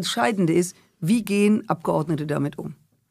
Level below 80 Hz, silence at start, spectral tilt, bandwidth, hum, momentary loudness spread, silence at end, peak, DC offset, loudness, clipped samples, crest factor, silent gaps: -62 dBFS; 0 s; -5.5 dB/octave; 15.5 kHz; none; 10 LU; 0.35 s; -6 dBFS; under 0.1%; -23 LUFS; under 0.1%; 18 dB; none